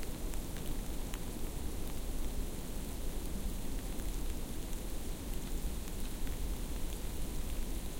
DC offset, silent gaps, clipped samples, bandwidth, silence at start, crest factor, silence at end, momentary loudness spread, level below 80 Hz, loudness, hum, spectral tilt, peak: under 0.1%; none; under 0.1%; 17 kHz; 0 s; 20 dB; 0 s; 1 LU; -38 dBFS; -43 LUFS; none; -4.5 dB/octave; -18 dBFS